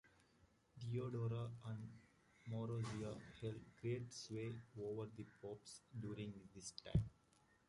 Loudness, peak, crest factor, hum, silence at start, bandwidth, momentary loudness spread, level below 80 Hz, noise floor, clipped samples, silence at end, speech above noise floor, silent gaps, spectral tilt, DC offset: -49 LUFS; -24 dBFS; 24 dB; none; 0.05 s; 11.5 kHz; 11 LU; -64 dBFS; -76 dBFS; under 0.1%; 0.55 s; 28 dB; none; -6.5 dB/octave; under 0.1%